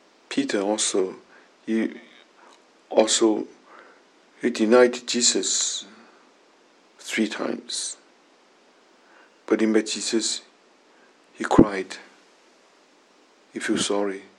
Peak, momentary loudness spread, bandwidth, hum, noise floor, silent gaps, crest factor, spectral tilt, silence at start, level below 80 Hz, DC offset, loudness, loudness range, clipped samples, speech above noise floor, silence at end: 0 dBFS; 19 LU; 12 kHz; none; -57 dBFS; none; 26 dB; -3 dB/octave; 0.3 s; -56 dBFS; under 0.1%; -23 LUFS; 7 LU; under 0.1%; 35 dB; 0.15 s